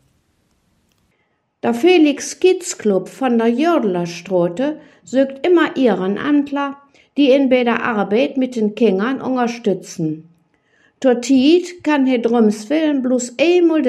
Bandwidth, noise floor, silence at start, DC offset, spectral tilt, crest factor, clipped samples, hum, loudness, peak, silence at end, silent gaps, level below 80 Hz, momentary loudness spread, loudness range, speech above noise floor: 12 kHz; -66 dBFS; 1.65 s; under 0.1%; -5 dB/octave; 14 dB; under 0.1%; none; -16 LUFS; -2 dBFS; 0 s; none; -68 dBFS; 9 LU; 2 LU; 50 dB